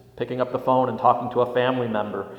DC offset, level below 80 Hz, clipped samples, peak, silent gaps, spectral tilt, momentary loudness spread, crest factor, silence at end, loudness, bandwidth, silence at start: under 0.1%; -62 dBFS; under 0.1%; -4 dBFS; none; -8 dB/octave; 7 LU; 20 dB; 0 s; -23 LUFS; 5.8 kHz; 0.15 s